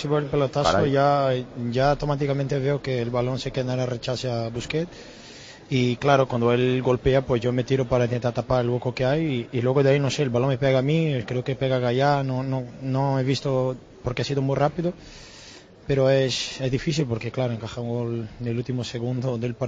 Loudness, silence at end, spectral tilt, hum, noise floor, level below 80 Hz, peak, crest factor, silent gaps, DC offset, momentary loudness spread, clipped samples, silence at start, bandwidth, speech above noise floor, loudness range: -24 LUFS; 0 s; -6.5 dB/octave; none; -46 dBFS; -46 dBFS; -6 dBFS; 18 dB; none; under 0.1%; 9 LU; under 0.1%; 0 s; 7.8 kHz; 23 dB; 4 LU